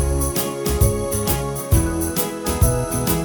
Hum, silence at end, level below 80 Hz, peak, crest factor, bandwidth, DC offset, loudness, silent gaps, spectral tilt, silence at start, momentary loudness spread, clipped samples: none; 0 s; -26 dBFS; -4 dBFS; 16 dB; over 20 kHz; under 0.1%; -20 LUFS; none; -5 dB/octave; 0 s; 3 LU; under 0.1%